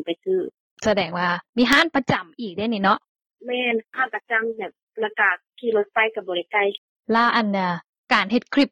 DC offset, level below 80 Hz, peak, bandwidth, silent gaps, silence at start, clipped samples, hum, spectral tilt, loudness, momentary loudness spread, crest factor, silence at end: under 0.1%; -60 dBFS; -4 dBFS; 18 kHz; 0.60-0.77 s, 1.49-1.53 s, 3.09-3.15 s, 3.26-3.30 s, 4.83-4.87 s, 6.78-6.96 s, 7.89-8.04 s; 0 s; under 0.1%; none; -5 dB/octave; -22 LUFS; 11 LU; 18 dB; 0.05 s